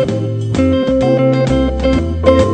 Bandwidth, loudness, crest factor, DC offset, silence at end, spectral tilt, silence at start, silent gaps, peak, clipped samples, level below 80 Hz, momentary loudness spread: 9.2 kHz; -14 LUFS; 12 dB; under 0.1%; 0 s; -7.5 dB/octave; 0 s; none; 0 dBFS; under 0.1%; -24 dBFS; 5 LU